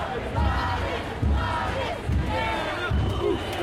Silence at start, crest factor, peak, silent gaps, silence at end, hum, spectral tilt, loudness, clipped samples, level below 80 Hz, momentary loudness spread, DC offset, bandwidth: 0 s; 12 dB; -12 dBFS; none; 0 s; none; -6.5 dB/octave; -26 LUFS; under 0.1%; -32 dBFS; 3 LU; under 0.1%; 13.5 kHz